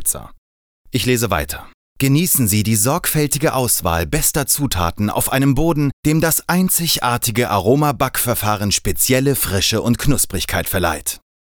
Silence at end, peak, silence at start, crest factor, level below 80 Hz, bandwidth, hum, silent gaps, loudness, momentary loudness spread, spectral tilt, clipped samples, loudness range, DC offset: 0.4 s; -4 dBFS; 0 s; 14 dB; -34 dBFS; over 20 kHz; none; 0.38-0.85 s, 1.74-1.96 s, 5.93-6.03 s; -17 LUFS; 6 LU; -4 dB/octave; under 0.1%; 1 LU; under 0.1%